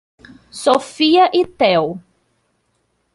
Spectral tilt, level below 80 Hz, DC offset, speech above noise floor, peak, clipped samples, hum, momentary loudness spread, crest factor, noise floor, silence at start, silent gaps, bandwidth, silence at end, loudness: -4.5 dB/octave; -58 dBFS; under 0.1%; 51 dB; -2 dBFS; under 0.1%; none; 15 LU; 16 dB; -66 dBFS; 0.55 s; none; 11.5 kHz; 1.15 s; -15 LUFS